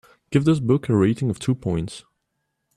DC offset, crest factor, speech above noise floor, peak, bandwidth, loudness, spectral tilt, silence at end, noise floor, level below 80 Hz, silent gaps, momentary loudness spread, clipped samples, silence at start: under 0.1%; 18 dB; 56 dB; -6 dBFS; 12 kHz; -21 LUFS; -7.5 dB/octave; 0.75 s; -76 dBFS; -52 dBFS; none; 9 LU; under 0.1%; 0.3 s